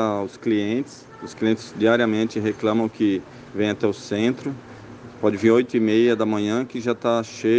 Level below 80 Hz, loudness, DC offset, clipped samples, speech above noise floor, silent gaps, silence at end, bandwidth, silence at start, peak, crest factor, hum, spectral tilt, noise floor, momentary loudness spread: -62 dBFS; -22 LUFS; under 0.1%; under 0.1%; 19 dB; none; 0 s; 8.8 kHz; 0 s; -4 dBFS; 18 dB; none; -6 dB/octave; -40 dBFS; 16 LU